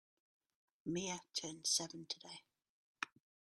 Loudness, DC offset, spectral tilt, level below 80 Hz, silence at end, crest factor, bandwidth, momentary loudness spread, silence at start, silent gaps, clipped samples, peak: -42 LUFS; under 0.1%; -2 dB/octave; -82 dBFS; 0.4 s; 26 dB; 13 kHz; 14 LU; 0.85 s; 2.69-2.95 s; under 0.1%; -20 dBFS